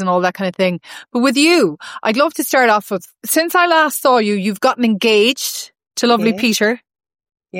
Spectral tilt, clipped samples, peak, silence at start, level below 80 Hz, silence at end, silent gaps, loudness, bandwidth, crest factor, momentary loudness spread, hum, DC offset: -3.5 dB/octave; under 0.1%; -2 dBFS; 0 s; -70 dBFS; 0 s; none; -15 LUFS; 16.5 kHz; 14 dB; 10 LU; none; under 0.1%